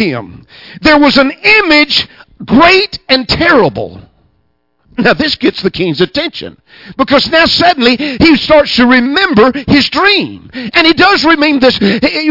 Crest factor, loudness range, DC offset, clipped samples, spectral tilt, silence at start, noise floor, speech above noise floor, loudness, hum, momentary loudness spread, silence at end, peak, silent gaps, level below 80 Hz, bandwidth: 10 dB; 5 LU; under 0.1%; 0.3%; -5 dB/octave; 0 s; -59 dBFS; 50 dB; -8 LUFS; none; 12 LU; 0 s; 0 dBFS; none; -36 dBFS; 6 kHz